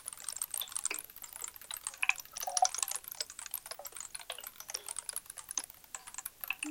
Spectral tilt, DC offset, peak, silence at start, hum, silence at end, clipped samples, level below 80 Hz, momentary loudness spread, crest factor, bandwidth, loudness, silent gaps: 1.5 dB/octave; under 0.1%; -10 dBFS; 0 s; none; 0 s; under 0.1%; -72 dBFS; 12 LU; 32 dB; 17 kHz; -38 LUFS; none